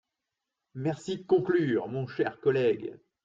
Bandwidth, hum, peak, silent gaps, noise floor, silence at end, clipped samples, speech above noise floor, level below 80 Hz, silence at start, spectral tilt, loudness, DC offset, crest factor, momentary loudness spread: 7.8 kHz; none; -12 dBFS; none; -86 dBFS; 0.3 s; under 0.1%; 58 dB; -70 dBFS; 0.75 s; -7.5 dB/octave; -29 LUFS; under 0.1%; 16 dB; 10 LU